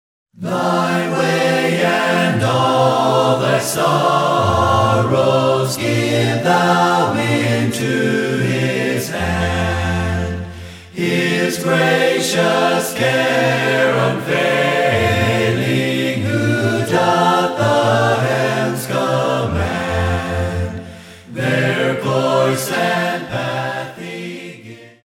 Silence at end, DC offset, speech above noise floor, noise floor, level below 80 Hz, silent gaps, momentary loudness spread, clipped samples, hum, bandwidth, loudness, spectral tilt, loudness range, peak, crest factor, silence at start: 0.15 s; under 0.1%; 22 dB; -37 dBFS; -40 dBFS; none; 8 LU; under 0.1%; none; 16.5 kHz; -16 LUFS; -5 dB/octave; 4 LU; -2 dBFS; 14 dB; 0.4 s